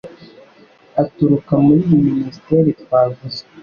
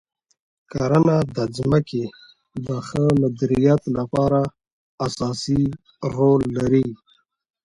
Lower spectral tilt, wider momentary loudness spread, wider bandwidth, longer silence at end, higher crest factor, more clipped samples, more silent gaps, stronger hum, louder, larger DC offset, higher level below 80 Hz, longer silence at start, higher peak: first, -10 dB/octave vs -7.5 dB/octave; about the same, 11 LU vs 11 LU; second, 6.8 kHz vs 11 kHz; second, 0 s vs 0.7 s; about the same, 14 dB vs 16 dB; neither; second, none vs 4.72-4.98 s; neither; first, -16 LUFS vs -21 LUFS; neither; about the same, -50 dBFS vs -48 dBFS; second, 0.05 s vs 0.75 s; about the same, -2 dBFS vs -4 dBFS